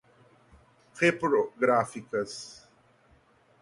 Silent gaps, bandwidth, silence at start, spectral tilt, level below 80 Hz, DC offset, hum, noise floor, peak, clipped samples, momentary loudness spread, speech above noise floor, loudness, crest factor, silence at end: none; 11.5 kHz; 0.95 s; -5 dB/octave; -68 dBFS; under 0.1%; none; -63 dBFS; -10 dBFS; under 0.1%; 13 LU; 35 dB; -27 LUFS; 22 dB; 1.1 s